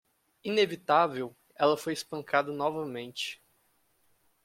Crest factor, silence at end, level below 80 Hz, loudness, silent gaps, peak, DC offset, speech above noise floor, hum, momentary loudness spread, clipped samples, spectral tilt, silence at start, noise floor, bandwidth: 22 dB; 1.1 s; -76 dBFS; -30 LUFS; none; -10 dBFS; under 0.1%; 41 dB; none; 13 LU; under 0.1%; -4 dB/octave; 0.45 s; -70 dBFS; 16.5 kHz